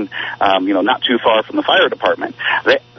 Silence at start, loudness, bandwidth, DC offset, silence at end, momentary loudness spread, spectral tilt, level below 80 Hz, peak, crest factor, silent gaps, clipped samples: 0 s; -15 LUFS; 6.2 kHz; under 0.1%; 0.2 s; 5 LU; -5 dB/octave; -60 dBFS; 0 dBFS; 14 dB; none; under 0.1%